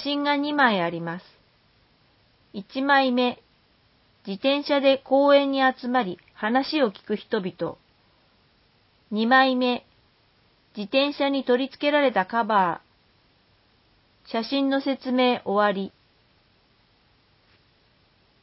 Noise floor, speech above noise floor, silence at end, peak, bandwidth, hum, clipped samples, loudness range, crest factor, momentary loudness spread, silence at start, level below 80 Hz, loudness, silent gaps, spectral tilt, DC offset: -62 dBFS; 40 dB; 2.55 s; -6 dBFS; 5.8 kHz; none; under 0.1%; 5 LU; 20 dB; 15 LU; 0 s; -70 dBFS; -23 LUFS; none; -9 dB/octave; under 0.1%